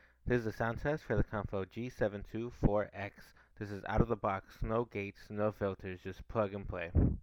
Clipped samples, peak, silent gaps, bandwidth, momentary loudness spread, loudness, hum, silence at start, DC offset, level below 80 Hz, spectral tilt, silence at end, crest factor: under 0.1%; -12 dBFS; none; 18.5 kHz; 10 LU; -37 LUFS; none; 0.25 s; under 0.1%; -44 dBFS; -8.5 dB/octave; 0 s; 24 dB